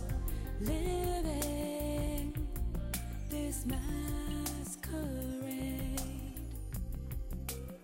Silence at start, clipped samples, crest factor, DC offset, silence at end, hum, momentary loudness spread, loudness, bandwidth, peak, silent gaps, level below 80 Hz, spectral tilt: 0 s; under 0.1%; 12 dB; under 0.1%; 0 s; none; 7 LU; -39 LUFS; 16.5 kHz; -26 dBFS; none; -40 dBFS; -5.5 dB/octave